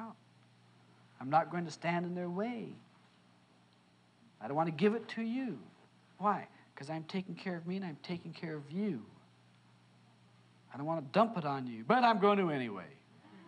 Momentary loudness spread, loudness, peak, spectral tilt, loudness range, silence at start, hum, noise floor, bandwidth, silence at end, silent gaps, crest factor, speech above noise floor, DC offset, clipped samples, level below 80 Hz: 18 LU; -35 LUFS; -14 dBFS; -7 dB/octave; 9 LU; 0 s; 60 Hz at -65 dBFS; -67 dBFS; 10 kHz; 0 s; none; 24 dB; 32 dB; under 0.1%; under 0.1%; -88 dBFS